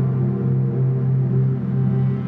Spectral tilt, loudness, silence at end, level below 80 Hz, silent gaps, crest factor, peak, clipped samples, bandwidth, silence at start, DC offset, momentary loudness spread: -13 dB/octave; -20 LUFS; 0 s; -54 dBFS; none; 10 dB; -10 dBFS; under 0.1%; 2.5 kHz; 0 s; under 0.1%; 1 LU